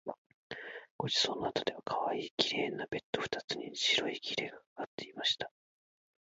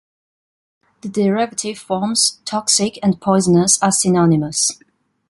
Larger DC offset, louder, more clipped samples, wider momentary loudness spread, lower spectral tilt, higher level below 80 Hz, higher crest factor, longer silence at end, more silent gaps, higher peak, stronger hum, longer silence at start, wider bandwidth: neither; second, -35 LUFS vs -16 LUFS; neither; first, 15 LU vs 9 LU; second, -1 dB/octave vs -4 dB/octave; second, -72 dBFS vs -54 dBFS; first, 28 dB vs 18 dB; first, 0.8 s vs 0.55 s; first, 0.18-0.50 s, 0.91-0.99 s, 2.31-2.38 s, 3.03-3.13 s, 3.44-3.48 s, 4.66-4.76 s, 4.87-4.98 s vs none; second, -10 dBFS vs 0 dBFS; neither; second, 0.05 s vs 1.05 s; second, 7.6 kHz vs 11.5 kHz